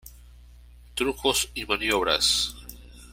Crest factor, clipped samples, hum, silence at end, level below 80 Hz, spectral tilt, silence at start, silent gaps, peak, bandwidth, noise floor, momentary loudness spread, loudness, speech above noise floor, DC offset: 22 dB; under 0.1%; 60 Hz at -45 dBFS; 0 s; -46 dBFS; -1.5 dB/octave; 0.05 s; none; -8 dBFS; 16.5 kHz; -49 dBFS; 16 LU; -24 LUFS; 24 dB; under 0.1%